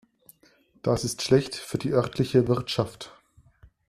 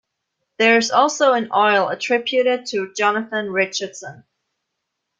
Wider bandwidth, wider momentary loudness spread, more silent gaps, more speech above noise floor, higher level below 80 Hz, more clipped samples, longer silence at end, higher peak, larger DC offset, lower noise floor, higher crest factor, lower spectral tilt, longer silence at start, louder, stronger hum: first, 14 kHz vs 9.4 kHz; about the same, 10 LU vs 11 LU; neither; second, 37 dB vs 59 dB; first, -54 dBFS vs -68 dBFS; neither; second, 0.8 s vs 1.05 s; second, -6 dBFS vs -2 dBFS; neither; second, -61 dBFS vs -78 dBFS; about the same, 20 dB vs 18 dB; first, -5.5 dB/octave vs -2.5 dB/octave; first, 0.85 s vs 0.6 s; second, -26 LUFS vs -18 LUFS; neither